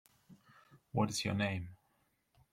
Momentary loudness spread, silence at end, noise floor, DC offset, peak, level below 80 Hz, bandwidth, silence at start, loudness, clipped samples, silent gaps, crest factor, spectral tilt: 9 LU; 0.75 s; -77 dBFS; under 0.1%; -18 dBFS; -68 dBFS; 16 kHz; 0.3 s; -37 LUFS; under 0.1%; none; 22 dB; -5 dB/octave